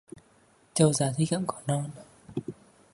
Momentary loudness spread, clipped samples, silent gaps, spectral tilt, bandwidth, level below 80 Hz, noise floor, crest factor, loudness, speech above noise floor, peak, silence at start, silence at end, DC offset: 16 LU; under 0.1%; none; -5.5 dB/octave; 11.5 kHz; -62 dBFS; -62 dBFS; 24 dB; -28 LUFS; 35 dB; -6 dBFS; 0.15 s; 0.4 s; under 0.1%